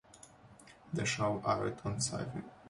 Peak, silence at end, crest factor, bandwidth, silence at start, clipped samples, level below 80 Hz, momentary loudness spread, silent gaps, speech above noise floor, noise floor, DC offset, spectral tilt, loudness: -20 dBFS; 0 s; 18 dB; 11.5 kHz; 0.15 s; under 0.1%; -62 dBFS; 23 LU; none; 23 dB; -58 dBFS; under 0.1%; -4.5 dB/octave; -36 LUFS